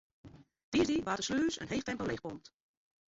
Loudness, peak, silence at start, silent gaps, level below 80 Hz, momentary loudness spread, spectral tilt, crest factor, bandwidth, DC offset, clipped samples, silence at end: -34 LUFS; -20 dBFS; 0.25 s; 0.64-0.72 s; -60 dBFS; 11 LU; -4 dB/octave; 16 dB; 8 kHz; under 0.1%; under 0.1%; 0.7 s